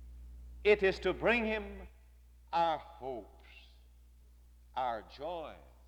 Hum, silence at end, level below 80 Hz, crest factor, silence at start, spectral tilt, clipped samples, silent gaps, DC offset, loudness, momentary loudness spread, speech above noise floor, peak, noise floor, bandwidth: 60 Hz at -55 dBFS; 0.2 s; -54 dBFS; 22 dB; 0 s; -6 dB/octave; under 0.1%; none; under 0.1%; -34 LUFS; 23 LU; 26 dB; -14 dBFS; -59 dBFS; 10 kHz